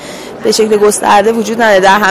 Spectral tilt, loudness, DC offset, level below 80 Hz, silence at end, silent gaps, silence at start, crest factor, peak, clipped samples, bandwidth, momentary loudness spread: -3 dB/octave; -9 LUFS; under 0.1%; -46 dBFS; 0 s; none; 0 s; 10 dB; 0 dBFS; 0.3%; 15.5 kHz; 8 LU